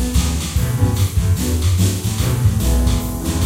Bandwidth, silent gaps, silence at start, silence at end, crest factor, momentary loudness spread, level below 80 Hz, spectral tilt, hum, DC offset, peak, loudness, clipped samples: 16 kHz; none; 0 s; 0 s; 14 dB; 3 LU; -22 dBFS; -5.5 dB/octave; none; under 0.1%; -2 dBFS; -18 LUFS; under 0.1%